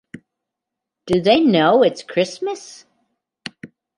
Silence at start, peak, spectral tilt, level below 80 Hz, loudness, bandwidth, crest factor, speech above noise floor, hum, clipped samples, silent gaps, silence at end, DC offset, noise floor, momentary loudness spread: 0.15 s; -2 dBFS; -5.5 dB/octave; -58 dBFS; -17 LUFS; 11.5 kHz; 18 dB; 67 dB; none; under 0.1%; none; 0.3 s; under 0.1%; -83 dBFS; 22 LU